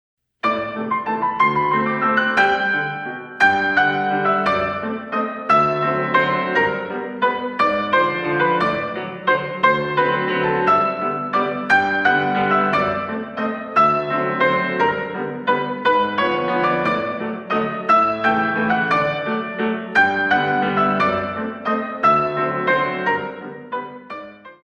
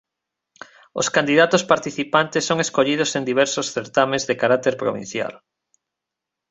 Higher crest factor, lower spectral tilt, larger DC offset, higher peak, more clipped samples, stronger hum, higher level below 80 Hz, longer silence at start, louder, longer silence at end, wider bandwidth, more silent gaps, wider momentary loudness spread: about the same, 16 dB vs 20 dB; first, -6 dB/octave vs -3.5 dB/octave; neither; about the same, -2 dBFS vs -2 dBFS; neither; neither; first, -56 dBFS vs -64 dBFS; second, 0.45 s vs 0.95 s; about the same, -19 LUFS vs -20 LUFS; second, 0.1 s vs 1.15 s; about the same, 9 kHz vs 8.2 kHz; neither; about the same, 9 LU vs 10 LU